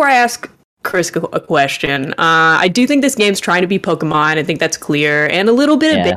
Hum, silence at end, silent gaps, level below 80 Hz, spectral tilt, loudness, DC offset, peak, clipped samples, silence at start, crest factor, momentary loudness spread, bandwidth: none; 0 s; 0.64-0.77 s; -54 dBFS; -4 dB/octave; -13 LUFS; under 0.1%; -2 dBFS; under 0.1%; 0 s; 12 dB; 7 LU; 15 kHz